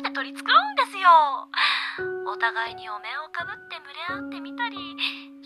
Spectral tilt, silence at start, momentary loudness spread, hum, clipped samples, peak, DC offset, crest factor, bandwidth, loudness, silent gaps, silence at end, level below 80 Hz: -2.5 dB/octave; 0 s; 16 LU; none; under 0.1%; -4 dBFS; under 0.1%; 20 dB; 12.5 kHz; -23 LUFS; none; 0 s; -72 dBFS